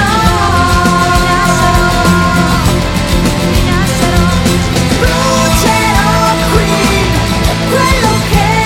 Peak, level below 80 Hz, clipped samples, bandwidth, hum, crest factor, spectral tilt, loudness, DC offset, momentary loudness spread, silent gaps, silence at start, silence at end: 0 dBFS; -18 dBFS; under 0.1%; 17 kHz; none; 10 dB; -4.5 dB/octave; -10 LUFS; under 0.1%; 2 LU; none; 0 s; 0 s